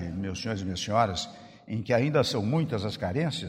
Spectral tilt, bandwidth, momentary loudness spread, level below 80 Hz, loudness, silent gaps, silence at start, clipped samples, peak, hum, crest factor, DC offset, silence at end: -5.5 dB/octave; 15 kHz; 11 LU; -56 dBFS; -28 LUFS; none; 0 s; under 0.1%; -10 dBFS; none; 18 dB; under 0.1%; 0 s